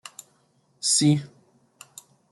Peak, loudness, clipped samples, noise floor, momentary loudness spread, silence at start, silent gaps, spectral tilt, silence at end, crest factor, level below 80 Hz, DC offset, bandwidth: -10 dBFS; -22 LUFS; under 0.1%; -65 dBFS; 26 LU; 0.85 s; none; -3.5 dB/octave; 1.05 s; 18 dB; -70 dBFS; under 0.1%; 12 kHz